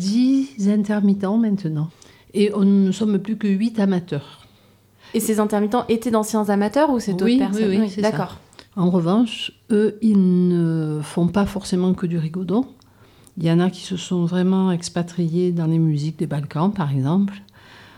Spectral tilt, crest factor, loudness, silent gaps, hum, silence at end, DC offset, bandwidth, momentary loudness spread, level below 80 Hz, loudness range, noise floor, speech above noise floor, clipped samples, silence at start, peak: -7 dB/octave; 14 dB; -20 LUFS; none; none; 0.55 s; under 0.1%; 15.5 kHz; 8 LU; -54 dBFS; 3 LU; -54 dBFS; 35 dB; under 0.1%; 0 s; -6 dBFS